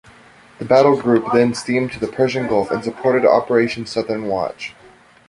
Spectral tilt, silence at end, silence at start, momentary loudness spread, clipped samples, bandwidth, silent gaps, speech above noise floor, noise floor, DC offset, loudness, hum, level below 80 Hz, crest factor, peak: -6 dB/octave; 0.6 s; 0.6 s; 9 LU; under 0.1%; 11.5 kHz; none; 30 dB; -47 dBFS; under 0.1%; -17 LUFS; none; -54 dBFS; 16 dB; -2 dBFS